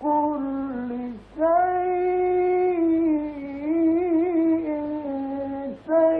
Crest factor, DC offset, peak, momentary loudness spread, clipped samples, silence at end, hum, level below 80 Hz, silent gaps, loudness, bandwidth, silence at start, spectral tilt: 12 dB; under 0.1%; -10 dBFS; 10 LU; under 0.1%; 0 s; none; -54 dBFS; none; -24 LUFS; 3.9 kHz; 0 s; -10 dB/octave